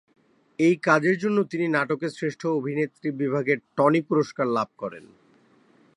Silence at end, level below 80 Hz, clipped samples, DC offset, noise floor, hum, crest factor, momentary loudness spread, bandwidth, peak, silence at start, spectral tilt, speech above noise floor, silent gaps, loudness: 1 s; -74 dBFS; under 0.1%; under 0.1%; -59 dBFS; none; 22 dB; 9 LU; 11 kHz; -4 dBFS; 0.6 s; -7 dB/octave; 35 dB; none; -24 LUFS